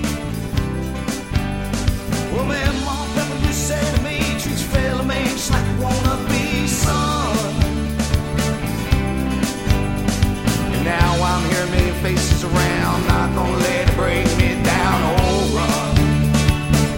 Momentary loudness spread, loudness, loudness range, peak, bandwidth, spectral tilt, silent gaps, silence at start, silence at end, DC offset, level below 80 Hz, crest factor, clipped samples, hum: 6 LU; -19 LUFS; 3 LU; -2 dBFS; 16.5 kHz; -5 dB/octave; none; 0 s; 0 s; under 0.1%; -26 dBFS; 16 dB; under 0.1%; none